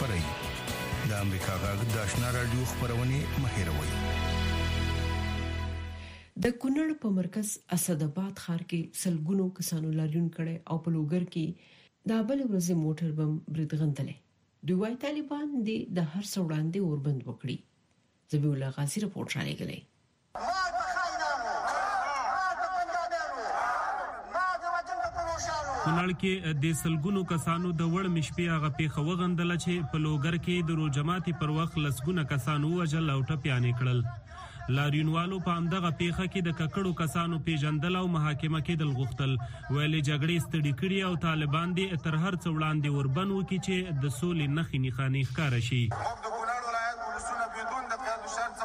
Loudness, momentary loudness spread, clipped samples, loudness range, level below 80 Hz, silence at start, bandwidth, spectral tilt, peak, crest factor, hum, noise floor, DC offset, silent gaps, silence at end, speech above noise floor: -31 LUFS; 6 LU; under 0.1%; 3 LU; -48 dBFS; 0 s; 15.5 kHz; -5.5 dB/octave; -12 dBFS; 18 dB; none; -69 dBFS; under 0.1%; none; 0 s; 40 dB